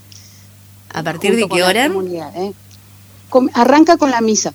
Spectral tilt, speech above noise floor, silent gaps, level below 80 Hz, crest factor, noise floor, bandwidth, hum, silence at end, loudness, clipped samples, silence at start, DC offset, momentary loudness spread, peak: -3.5 dB/octave; 28 dB; none; -58 dBFS; 16 dB; -42 dBFS; over 20 kHz; 50 Hz at -40 dBFS; 0 s; -14 LUFS; under 0.1%; 0.95 s; under 0.1%; 15 LU; 0 dBFS